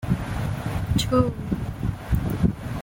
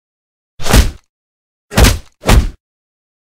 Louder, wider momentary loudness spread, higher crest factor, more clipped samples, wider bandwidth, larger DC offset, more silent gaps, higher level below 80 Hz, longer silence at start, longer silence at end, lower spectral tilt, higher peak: second, -25 LUFS vs -13 LUFS; second, 7 LU vs 11 LU; about the same, 18 dB vs 14 dB; second, under 0.1% vs 0.4%; about the same, 17 kHz vs 16.5 kHz; neither; second, none vs 1.09-1.69 s; second, -34 dBFS vs -16 dBFS; second, 0 s vs 0.6 s; second, 0 s vs 0.8 s; first, -6.5 dB/octave vs -4.5 dB/octave; second, -6 dBFS vs 0 dBFS